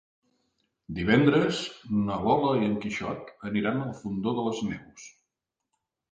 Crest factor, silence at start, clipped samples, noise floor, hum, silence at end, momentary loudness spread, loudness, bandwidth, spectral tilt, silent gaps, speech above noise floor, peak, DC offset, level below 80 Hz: 20 dB; 0.9 s; under 0.1%; -85 dBFS; none; 1.05 s; 15 LU; -27 LUFS; 9.2 kHz; -6.5 dB/octave; none; 58 dB; -8 dBFS; under 0.1%; -56 dBFS